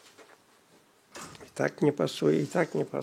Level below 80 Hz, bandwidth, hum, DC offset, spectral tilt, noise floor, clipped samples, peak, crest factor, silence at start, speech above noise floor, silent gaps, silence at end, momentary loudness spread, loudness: -76 dBFS; 15.5 kHz; none; under 0.1%; -6 dB/octave; -62 dBFS; under 0.1%; -12 dBFS; 20 dB; 0.2 s; 34 dB; none; 0 s; 18 LU; -28 LUFS